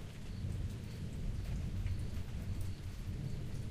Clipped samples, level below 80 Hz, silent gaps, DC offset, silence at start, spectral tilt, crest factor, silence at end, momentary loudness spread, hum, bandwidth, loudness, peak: under 0.1%; -44 dBFS; none; under 0.1%; 0 s; -6.5 dB/octave; 14 dB; 0 s; 4 LU; none; 15.5 kHz; -43 LUFS; -26 dBFS